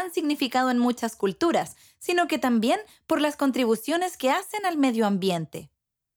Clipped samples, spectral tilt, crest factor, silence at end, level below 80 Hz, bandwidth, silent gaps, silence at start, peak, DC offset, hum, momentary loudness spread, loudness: under 0.1%; -4.5 dB/octave; 16 dB; 0.5 s; -68 dBFS; over 20 kHz; none; 0 s; -10 dBFS; under 0.1%; none; 6 LU; -25 LUFS